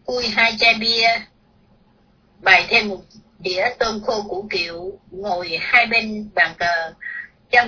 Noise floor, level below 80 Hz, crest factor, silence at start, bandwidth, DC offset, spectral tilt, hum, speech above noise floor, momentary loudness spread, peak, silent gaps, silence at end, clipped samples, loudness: -56 dBFS; -52 dBFS; 20 dB; 0.1 s; 5.4 kHz; under 0.1%; -2.5 dB/octave; none; 37 dB; 17 LU; 0 dBFS; none; 0 s; under 0.1%; -17 LUFS